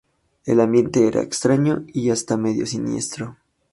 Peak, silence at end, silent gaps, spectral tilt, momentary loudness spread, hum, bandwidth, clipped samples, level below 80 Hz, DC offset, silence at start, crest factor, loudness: -4 dBFS; 0.4 s; none; -5.5 dB/octave; 11 LU; none; 11.5 kHz; under 0.1%; -56 dBFS; under 0.1%; 0.45 s; 18 dB; -20 LUFS